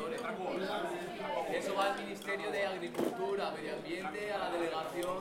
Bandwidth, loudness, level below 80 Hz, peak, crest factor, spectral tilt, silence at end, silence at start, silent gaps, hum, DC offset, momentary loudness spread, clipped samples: 16.5 kHz; -37 LUFS; -70 dBFS; -18 dBFS; 18 dB; -4 dB/octave; 0 s; 0 s; none; none; under 0.1%; 5 LU; under 0.1%